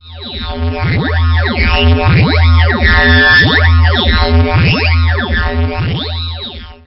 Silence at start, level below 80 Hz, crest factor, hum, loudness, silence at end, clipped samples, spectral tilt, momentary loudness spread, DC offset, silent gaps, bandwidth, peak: 0.05 s; -16 dBFS; 10 dB; none; -10 LUFS; 0.1 s; under 0.1%; -9.5 dB/octave; 13 LU; under 0.1%; none; 5.8 kHz; 0 dBFS